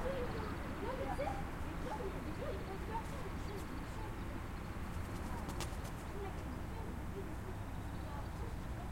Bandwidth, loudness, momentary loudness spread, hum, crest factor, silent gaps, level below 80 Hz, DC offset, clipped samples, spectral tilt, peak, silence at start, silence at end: 16.5 kHz; -44 LUFS; 4 LU; none; 20 dB; none; -48 dBFS; under 0.1%; under 0.1%; -6 dB/octave; -22 dBFS; 0 s; 0 s